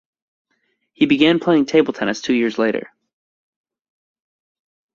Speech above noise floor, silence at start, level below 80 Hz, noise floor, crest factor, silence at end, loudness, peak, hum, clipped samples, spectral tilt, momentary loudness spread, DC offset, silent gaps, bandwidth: 52 dB; 1 s; -62 dBFS; -69 dBFS; 20 dB; 2.1 s; -17 LUFS; -2 dBFS; none; under 0.1%; -5.5 dB/octave; 7 LU; under 0.1%; none; 7.4 kHz